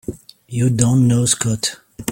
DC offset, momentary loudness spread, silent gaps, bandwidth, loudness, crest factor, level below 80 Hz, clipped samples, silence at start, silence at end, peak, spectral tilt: under 0.1%; 14 LU; none; 16.5 kHz; -16 LUFS; 16 dB; -46 dBFS; under 0.1%; 0.1 s; 0 s; -2 dBFS; -5 dB/octave